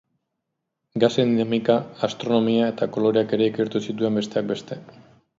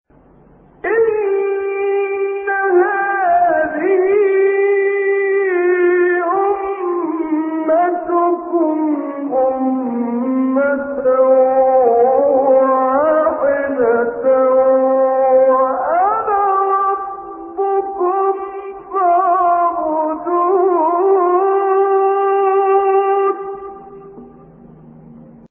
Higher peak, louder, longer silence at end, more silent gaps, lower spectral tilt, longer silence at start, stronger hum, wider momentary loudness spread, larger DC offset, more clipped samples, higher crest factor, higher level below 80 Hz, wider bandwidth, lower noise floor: about the same, -4 dBFS vs -2 dBFS; second, -22 LUFS vs -15 LUFS; first, 0.5 s vs 0.25 s; neither; first, -6.5 dB/octave vs 2 dB/octave; about the same, 0.95 s vs 0.85 s; neither; about the same, 9 LU vs 7 LU; neither; neither; first, 20 dB vs 12 dB; second, -66 dBFS vs -56 dBFS; first, 7.8 kHz vs 3.3 kHz; first, -80 dBFS vs -47 dBFS